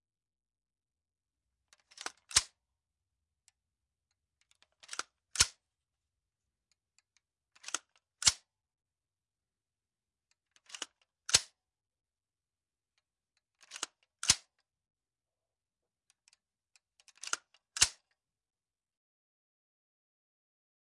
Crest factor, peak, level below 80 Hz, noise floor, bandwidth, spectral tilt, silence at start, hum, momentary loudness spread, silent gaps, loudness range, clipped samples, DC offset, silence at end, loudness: 34 dB; -8 dBFS; -66 dBFS; under -90 dBFS; 11.5 kHz; 1 dB/octave; 2.05 s; none; 19 LU; none; 1 LU; under 0.1%; under 0.1%; 3 s; -32 LUFS